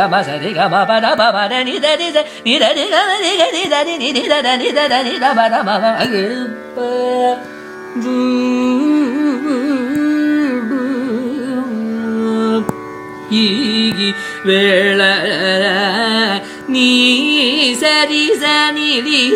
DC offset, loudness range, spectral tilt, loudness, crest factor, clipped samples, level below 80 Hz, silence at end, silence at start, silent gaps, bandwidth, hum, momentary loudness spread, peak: under 0.1%; 5 LU; -3.5 dB/octave; -14 LUFS; 14 dB; under 0.1%; -60 dBFS; 0 s; 0 s; none; 15.5 kHz; none; 9 LU; 0 dBFS